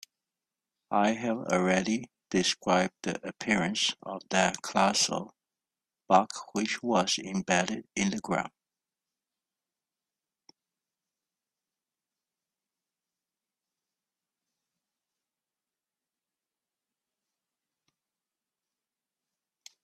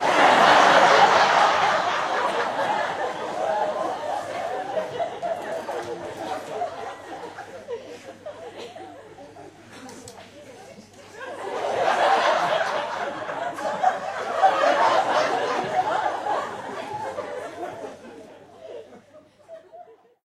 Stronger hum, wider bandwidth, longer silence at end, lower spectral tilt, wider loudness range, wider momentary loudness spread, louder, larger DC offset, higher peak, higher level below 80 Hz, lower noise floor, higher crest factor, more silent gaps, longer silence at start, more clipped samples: neither; second, 13 kHz vs 14.5 kHz; first, 11.35 s vs 0.45 s; about the same, -3.5 dB/octave vs -2.5 dB/octave; second, 7 LU vs 18 LU; second, 9 LU vs 25 LU; second, -28 LUFS vs -22 LUFS; neither; second, -8 dBFS vs -4 dBFS; about the same, -70 dBFS vs -68 dBFS; first, under -90 dBFS vs -52 dBFS; about the same, 26 dB vs 22 dB; neither; first, 0.9 s vs 0 s; neither